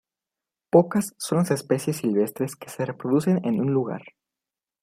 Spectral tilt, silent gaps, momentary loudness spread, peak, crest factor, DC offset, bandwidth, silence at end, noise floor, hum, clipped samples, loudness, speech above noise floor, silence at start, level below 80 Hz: -6.5 dB/octave; none; 11 LU; -2 dBFS; 22 dB; under 0.1%; 15.5 kHz; 0.8 s; -89 dBFS; none; under 0.1%; -24 LUFS; 66 dB; 0.75 s; -68 dBFS